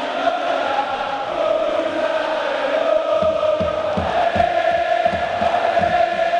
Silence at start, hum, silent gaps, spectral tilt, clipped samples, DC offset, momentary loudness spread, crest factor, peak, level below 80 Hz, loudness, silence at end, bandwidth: 0 s; none; none; -5 dB/octave; under 0.1%; under 0.1%; 3 LU; 14 dB; -4 dBFS; -46 dBFS; -19 LUFS; 0 s; 10 kHz